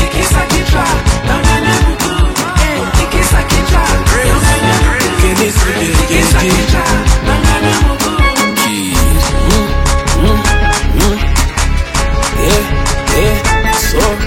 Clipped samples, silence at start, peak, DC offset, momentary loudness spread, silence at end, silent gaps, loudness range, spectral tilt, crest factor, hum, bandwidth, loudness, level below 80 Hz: under 0.1%; 0 s; 0 dBFS; under 0.1%; 3 LU; 0 s; none; 2 LU; -4 dB/octave; 10 dB; none; 17 kHz; -11 LUFS; -14 dBFS